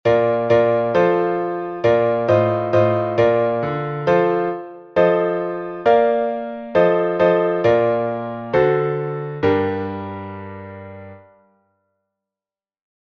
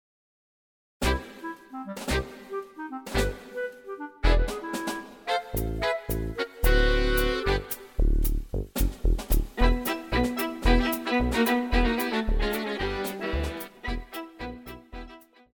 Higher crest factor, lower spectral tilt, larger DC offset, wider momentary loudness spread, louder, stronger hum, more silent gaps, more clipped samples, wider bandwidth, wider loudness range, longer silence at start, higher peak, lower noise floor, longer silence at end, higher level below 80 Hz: about the same, 16 dB vs 18 dB; first, -8.5 dB/octave vs -5 dB/octave; neither; about the same, 13 LU vs 15 LU; first, -18 LUFS vs -28 LUFS; neither; neither; neither; second, 6.2 kHz vs over 20 kHz; about the same, 8 LU vs 6 LU; second, 0.05 s vs 1 s; first, -2 dBFS vs -8 dBFS; first, under -90 dBFS vs -48 dBFS; first, 1.95 s vs 0.35 s; second, -56 dBFS vs -30 dBFS